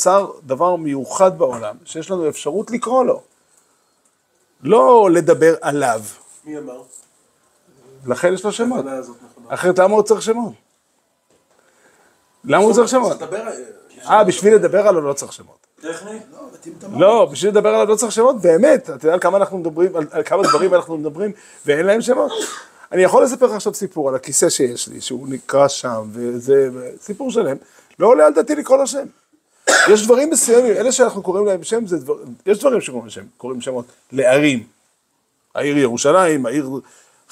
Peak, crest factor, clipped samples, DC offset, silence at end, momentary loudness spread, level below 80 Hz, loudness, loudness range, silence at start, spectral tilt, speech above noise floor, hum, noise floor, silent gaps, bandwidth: 0 dBFS; 16 dB; under 0.1%; under 0.1%; 0.5 s; 18 LU; -68 dBFS; -16 LUFS; 6 LU; 0 s; -4 dB/octave; 50 dB; none; -66 dBFS; none; 15.5 kHz